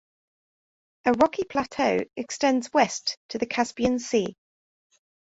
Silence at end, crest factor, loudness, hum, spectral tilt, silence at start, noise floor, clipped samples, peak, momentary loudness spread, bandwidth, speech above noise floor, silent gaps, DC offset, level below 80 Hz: 0.9 s; 20 dB; -25 LUFS; none; -3.5 dB/octave; 1.05 s; under -90 dBFS; under 0.1%; -6 dBFS; 8 LU; 8 kHz; over 65 dB; 3.17-3.29 s; under 0.1%; -60 dBFS